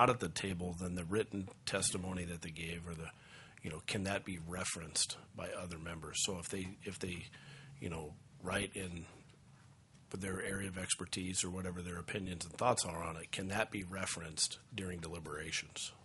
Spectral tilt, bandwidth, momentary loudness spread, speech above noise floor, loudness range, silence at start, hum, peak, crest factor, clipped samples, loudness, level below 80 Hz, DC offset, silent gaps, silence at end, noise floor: -3 dB/octave; 11.5 kHz; 12 LU; 22 dB; 5 LU; 0 s; none; -12 dBFS; 28 dB; under 0.1%; -40 LUFS; -64 dBFS; under 0.1%; none; 0 s; -62 dBFS